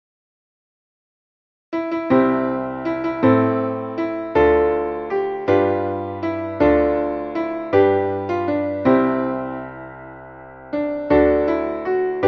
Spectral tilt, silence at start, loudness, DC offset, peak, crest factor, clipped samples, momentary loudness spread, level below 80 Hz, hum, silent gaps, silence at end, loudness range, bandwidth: -9 dB/octave; 1.7 s; -20 LUFS; under 0.1%; -2 dBFS; 16 dB; under 0.1%; 13 LU; -42 dBFS; none; none; 0 s; 3 LU; 6.2 kHz